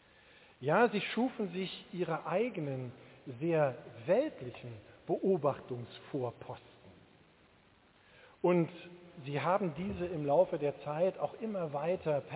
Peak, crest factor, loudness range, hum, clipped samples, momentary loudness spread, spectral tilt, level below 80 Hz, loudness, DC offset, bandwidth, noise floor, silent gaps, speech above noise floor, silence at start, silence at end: -16 dBFS; 20 dB; 5 LU; none; under 0.1%; 18 LU; -5.5 dB/octave; -68 dBFS; -34 LUFS; under 0.1%; 4 kHz; -65 dBFS; none; 31 dB; 0.6 s; 0 s